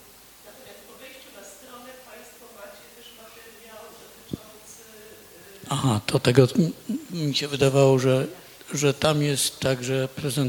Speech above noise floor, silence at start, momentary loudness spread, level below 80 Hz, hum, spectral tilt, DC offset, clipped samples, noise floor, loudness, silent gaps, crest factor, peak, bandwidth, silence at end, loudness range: 27 dB; 0.45 s; 26 LU; -58 dBFS; none; -5 dB/octave; under 0.1%; under 0.1%; -49 dBFS; -23 LUFS; none; 22 dB; -2 dBFS; 19 kHz; 0 s; 21 LU